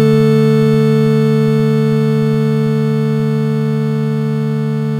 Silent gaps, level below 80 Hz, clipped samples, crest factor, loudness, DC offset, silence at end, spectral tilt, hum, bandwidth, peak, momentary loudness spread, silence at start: none; -52 dBFS; under 0.1%; 12 dB; -13 LUFS; under 0.1%; 0 s; -8.5 dB/octave; none; 12 kHz; 0 dBFS; 6 LU; 0 s